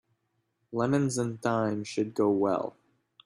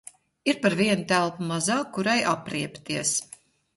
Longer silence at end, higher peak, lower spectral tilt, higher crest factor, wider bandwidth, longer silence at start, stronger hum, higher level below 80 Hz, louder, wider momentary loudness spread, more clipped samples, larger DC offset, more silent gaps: about the same, 0.55 s vs 0.5 s; second, -12 dBFS vs -6 dBFS; first, -6 dB/octave vs -3.5 dB/octave; about the same, 16 dB vs 20 dB; about the same, 12.5 kHz vs 11.5 kHz; first, 0.7 s vs 0.45 s; neither; about the same, -68 dBFS vs -66 dBFS; second, -29 LUFS vs -25 LUFS; about the same, 6 LU vs 8 LU; neither; neither; neither